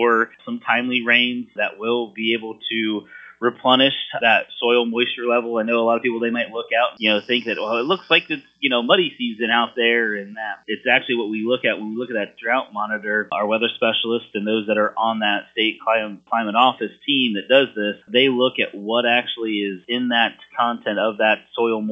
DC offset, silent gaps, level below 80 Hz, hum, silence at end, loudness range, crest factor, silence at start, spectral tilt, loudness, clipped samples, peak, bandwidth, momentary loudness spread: under 0.1%; none; -74 dBFS; none; 0 s; 3 LU; 20 dB; 0 s; -6.5 dB/octave; -20 LUFS; under 0.1%; 0 dBFS; 6 kHz; 8 LU